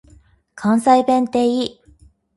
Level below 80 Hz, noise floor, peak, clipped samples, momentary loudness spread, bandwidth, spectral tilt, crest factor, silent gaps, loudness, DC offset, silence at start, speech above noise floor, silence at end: -54 dBFS; -51 dBFS; -2 dBFS; under 0.1%; 10 LU; 11.5 kHz; -5.5 dB/octave; 18 dB; none; -17 LUFS; under 0.1%; 0.55 s; 35 dB; 0.65 s